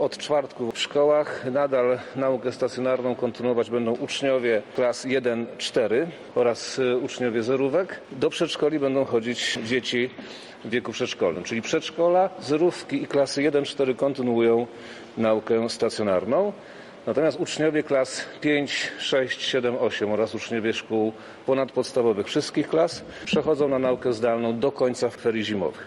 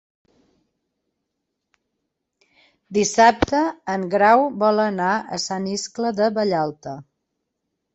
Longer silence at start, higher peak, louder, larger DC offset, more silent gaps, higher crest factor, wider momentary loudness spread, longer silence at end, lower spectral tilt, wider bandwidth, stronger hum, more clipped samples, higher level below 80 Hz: second, 0 s vs 2.9 s; second, -10 dBFS vs -2 dBFS; second, -24 LUFS vs -20 LUFS; neither; neither; second, 14 dB vs 20 dB; second, 6 LU vs 11 LU; second, 0 s vs 0.9 s; about the same, -4.5 dB/octave vs -4 dB/octave; first, 11.5 kHz vs 8.2 kHz; neither; neither; second, -66 dBFS vs -50 dBFS